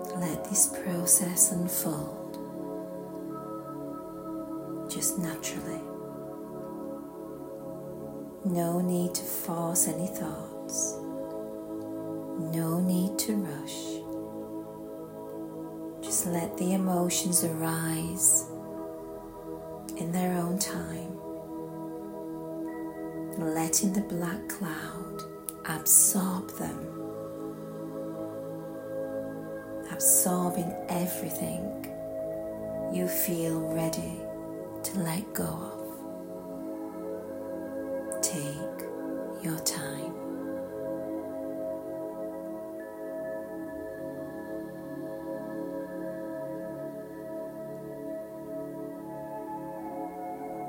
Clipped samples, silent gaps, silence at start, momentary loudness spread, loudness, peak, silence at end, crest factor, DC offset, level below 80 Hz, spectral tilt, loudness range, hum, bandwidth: under 0.1%; none; 0 s; 15 LU; -31 LUFS; -4 dBFS; 0 s; 28 dB; under 0.1%; -62 dBFS; -4 dB/octave; 11 LU; none; 16.5 kHz